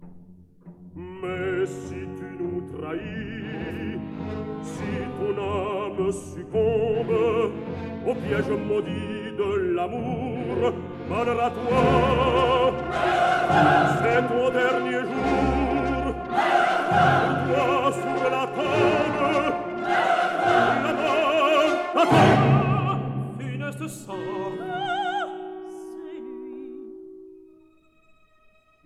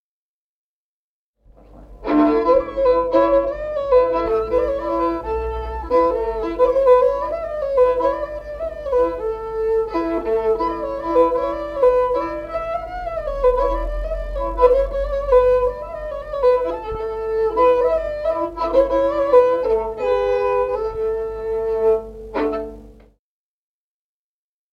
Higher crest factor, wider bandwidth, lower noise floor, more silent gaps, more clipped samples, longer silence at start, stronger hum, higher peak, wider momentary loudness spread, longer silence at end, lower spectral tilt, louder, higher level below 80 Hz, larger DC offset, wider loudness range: about the same, 20 dB vs 18 dB; first, 13.5 kHz vs 6.2 kHz; second, -59 dBFS vs under -90 dBFS; neither; neither; second, 0 s vs 1.75 s; neither; about the same, -4 dBFS vs -2 dBFS; first, 15 LU vs 11 LU; second, 1.45 s vs 1.8 s; about the same, -6.5 dB/octave vs -7.5 dB/octave; second, -24 LUFS vs -19 LUFS; second, -44 dBFS vs -36 dBFS; neither; first, 11 LU vs 3 LU